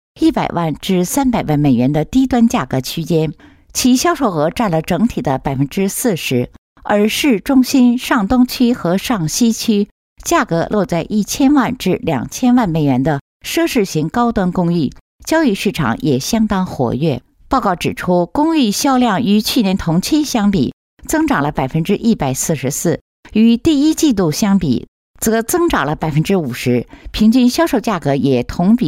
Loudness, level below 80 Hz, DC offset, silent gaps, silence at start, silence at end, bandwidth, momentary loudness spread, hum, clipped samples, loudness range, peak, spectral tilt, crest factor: -15 LUFS; -38 dBFS; under 0.1%; 6.58-6.76 s, 9.91-10.16 s, 13.21-13.40 s, 15.01-15.19 s, 20.73-20.97 s, 23.01-23.23 s, 24.88-25.14 s; 0.15 s; 0 s; 16 kHz; 6 LU; none; under 0.1%; 2 LU; -2 dBFS; -5 dB/octave; 12 dB